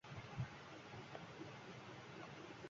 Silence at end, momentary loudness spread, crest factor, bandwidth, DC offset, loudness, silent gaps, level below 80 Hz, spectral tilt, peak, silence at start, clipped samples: 0 s; 5 LU; 20 dB; 7.4 kHz; under 0.1%; -53 LUFS; none; -72 dBFS; -4.5 dB/octave; -34 dBFS; 0.05 s; under 0.1%